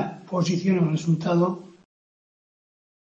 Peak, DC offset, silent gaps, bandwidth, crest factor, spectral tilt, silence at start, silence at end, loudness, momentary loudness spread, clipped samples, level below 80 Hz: -10 dBFS; under 0.1%; none; 7.6 kHz; 14 dB; -7 dB/octave; 0 s; 1.35 s; -24 LUFS; 6 LU; under 0.1%; -68 dBFS